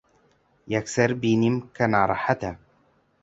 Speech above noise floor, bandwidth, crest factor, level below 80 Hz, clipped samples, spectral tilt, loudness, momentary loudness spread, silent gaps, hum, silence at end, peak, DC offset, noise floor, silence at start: 41 dB; 8 kHz; 20 dB; -54 dBFS; under 0.1%; -6 dB/octave; -24 LUFS; 8 LU; none; none; 0.65 s; -4 dBFS; under 0.1%; -64 dBFS; 0.65 s